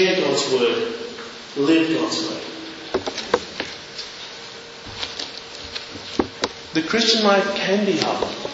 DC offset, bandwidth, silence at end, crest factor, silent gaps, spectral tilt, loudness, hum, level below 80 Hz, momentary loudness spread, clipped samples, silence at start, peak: under 0.1%; 8 kHz; 0 s; 22 dB; none; -3.5 dB/octave; -22 LUFS; none; -56 dBFS; 15 LU; under 0.1%; 0 s; 0 dBFS